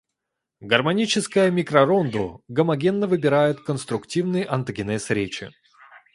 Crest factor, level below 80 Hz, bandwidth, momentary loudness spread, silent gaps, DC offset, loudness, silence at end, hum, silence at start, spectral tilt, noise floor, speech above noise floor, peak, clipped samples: 22 dB; -58 dBFS; 11.5 kHz; 9 LU; none; under 0.1%; -22 LUFS; 0.2 s; none; 0.6 s; -5.5 dB/octave; -82 dBFS; 61 dB; 0 dBFS; under 0.1%